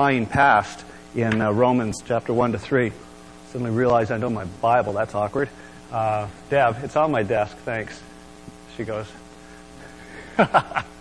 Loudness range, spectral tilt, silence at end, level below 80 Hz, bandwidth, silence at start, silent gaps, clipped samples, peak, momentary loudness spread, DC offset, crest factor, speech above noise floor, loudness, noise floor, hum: 5 LU; -6.5 dB/octave; 0 s; -50 dBFS; 11 kHz; 0 s; none; under 0.1%; -4 dBFS; 21 LU; 0.2%; 20 dB; 22 dB; -22 LUFS; -44 dBFS; none